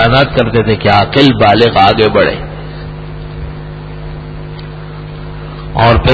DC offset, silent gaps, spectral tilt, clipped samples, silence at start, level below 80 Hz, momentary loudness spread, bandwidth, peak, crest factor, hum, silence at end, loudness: under 0.1%; none; -7.5 dB/octave; 0.3%; 0 s; -26 dBFS; 19 LU; 8 kHz; 0 dBFS; 12 dB; 50 Hz at -45 dBFS; 0 s; -9 LUFS